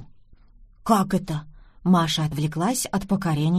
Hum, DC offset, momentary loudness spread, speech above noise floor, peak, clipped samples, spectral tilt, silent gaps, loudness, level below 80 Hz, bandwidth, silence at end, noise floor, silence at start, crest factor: none; under 0.1%; 11 LU; 29 dB; -6 dBFS; under 0.1%; -5.5 dB/octave; none; -23 LUFS; -48 dBFS; 15.5 kHz; 0 s; -51 dBFS; 0 s; 18 dB